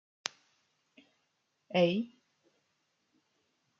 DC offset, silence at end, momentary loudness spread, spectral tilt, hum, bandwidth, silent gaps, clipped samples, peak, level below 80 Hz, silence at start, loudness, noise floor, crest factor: under 0.1%; 1.75 s; 13 LU; -4.5 dB/octave; none; 7.4 kHz; none; under 0.1%; -8 dBFS; -86 dBFS; 1.7 s; -33 LUFS; -79 dBFS; 30 dB